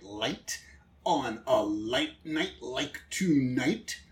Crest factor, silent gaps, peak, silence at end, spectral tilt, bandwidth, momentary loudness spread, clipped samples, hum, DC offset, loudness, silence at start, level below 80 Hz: 18 dB; none; -12 dBFS; 0.1 s; -4.5 dB/octave; 16.5 kHz; 9 LU; under 0.1%; none; under 0.1%; -31 LUFS; 0 s; -60 dBFS